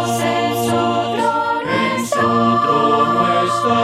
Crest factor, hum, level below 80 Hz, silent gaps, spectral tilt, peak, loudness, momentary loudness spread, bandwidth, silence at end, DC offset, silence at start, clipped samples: 14 dB; none; -54 dBFS; none; -5 dB/octave; -2 dBFS; -16 LUFS; 3 LU; 16 kHz; 0 s; under 0.1%; 0 s; under 0.1%